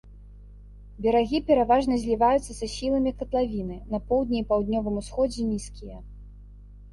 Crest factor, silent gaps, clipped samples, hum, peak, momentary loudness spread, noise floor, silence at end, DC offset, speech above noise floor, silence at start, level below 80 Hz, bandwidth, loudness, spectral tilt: 16 dB; none; under 0.1%; 50 Hz at -40 dBFS; -10 dBFS; 11 LU; -46 dBFS; 0 s; under 0.1%; 21 dB; 0.05 s; -42 dBFS; 11.5 kHz; -25 LUFS; -6 dB/octave